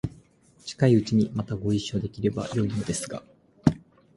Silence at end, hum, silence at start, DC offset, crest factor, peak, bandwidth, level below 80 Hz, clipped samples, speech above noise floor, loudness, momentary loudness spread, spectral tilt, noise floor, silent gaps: 0.4 s; none; 0.05 s; under 0.1%; 24 dB; -4 dBFS; 11.5 kHz; -50 dBFS; under 0.1%; 31 dB; -26 LUFS; 17 LU; -6.5 dB/octave; -57 dBFS; none